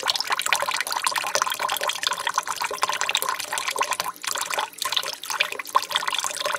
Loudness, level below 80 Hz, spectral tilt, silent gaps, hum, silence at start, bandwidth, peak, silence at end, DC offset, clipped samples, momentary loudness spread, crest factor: -24 LUFS; -72 dBFS; 1.5 dB/octave; none; none; 0 s; 16.5 kHz; -2 dBFS; 0 s; under 0.1%; under 0.1%; 4 LU; 22 dB